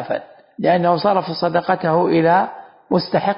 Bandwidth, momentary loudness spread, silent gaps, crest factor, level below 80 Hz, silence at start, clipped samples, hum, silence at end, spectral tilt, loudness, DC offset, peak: 5.4 kHz; 8 LU; none; 16 dB; -60 dBFS; 0 s; under 0.1%; none; 0 s; -11 dB/octave; -18 LUFS; under 0.1%; -2 dBFS